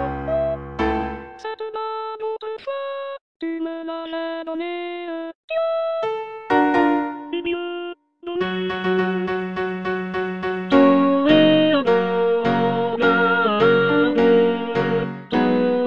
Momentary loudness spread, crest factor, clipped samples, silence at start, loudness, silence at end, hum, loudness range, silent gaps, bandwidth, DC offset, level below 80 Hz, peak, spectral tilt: 14 LU; 20 dB; under 0.1%; 0 s; -20 LUFS; 0 s; none; 11 LU; 3.21-3.40 s, 5.35-5.48 s; 7 kHz; under 0.1%; -46 dBFS; -2 dBFS; -7.5 dB/octave